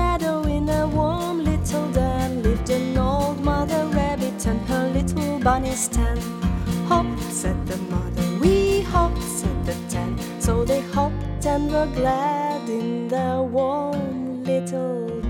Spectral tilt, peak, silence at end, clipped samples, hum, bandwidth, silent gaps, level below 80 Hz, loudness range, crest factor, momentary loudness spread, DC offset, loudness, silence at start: -6 dB/octave; -4 dBFS; 0 s; under 0.1%; none; 18 kHz; none; -30 dBFS; 1 LU; 18 dB; 5 LU; under 0.1%; -23 LUFS; 0 s